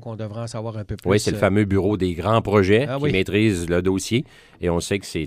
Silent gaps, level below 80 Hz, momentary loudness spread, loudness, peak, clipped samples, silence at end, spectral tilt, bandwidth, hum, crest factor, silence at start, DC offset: none; -44 dBFS; 12 LU; -21 LUFS; -4 dBFS; under 0.1%; 0 s; -6 dB/octave; 15.5 kHz; none; 18 dB; 0 s; under 0.1%